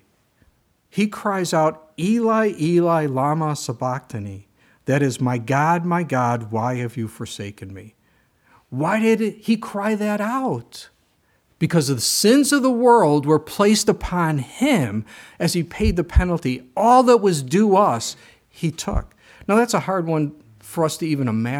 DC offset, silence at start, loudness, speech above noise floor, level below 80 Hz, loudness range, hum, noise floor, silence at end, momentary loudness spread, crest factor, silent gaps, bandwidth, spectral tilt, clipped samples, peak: under 0.1%; 0.95 s; -20 LUFS; 43 dB; -36 dBFS; 6 LU; none; -63 dBFS; 0 s; 15 LU; 18 dB; none; 17.5 kHz; -5.5 dB/octave; under 0.1%; -2 dBFS